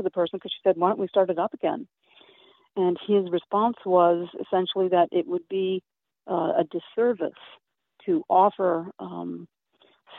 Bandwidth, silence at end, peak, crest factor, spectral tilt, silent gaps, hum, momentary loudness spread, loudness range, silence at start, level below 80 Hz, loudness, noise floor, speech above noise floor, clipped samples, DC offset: 4.1 kHz; 0 s; -8 dBFS; 18 dB; -4.5 dB/octave; none; none; 14 LU; 3 LU; 0 s; -76 dBFS; -25 LUFS; -63 dBFS; 39 dB; under 0.1%; under 0.1%